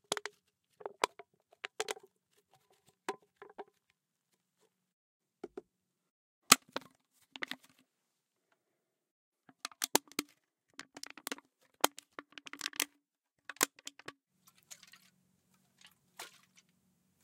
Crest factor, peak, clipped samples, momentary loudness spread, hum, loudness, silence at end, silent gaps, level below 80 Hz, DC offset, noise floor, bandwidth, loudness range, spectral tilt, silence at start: 40 dB; -2 dBFS; under 0.1%; 21 LU; none; -35 LUFS; 0.95 s; 4.93-5.20 s, 6.10-6.42 s, 9.11-9.32 s; under -90 dBFS; under 0.1%; -85 dBFS; 16 kHz; 18 LU; 0 dB/octave; 0.1 s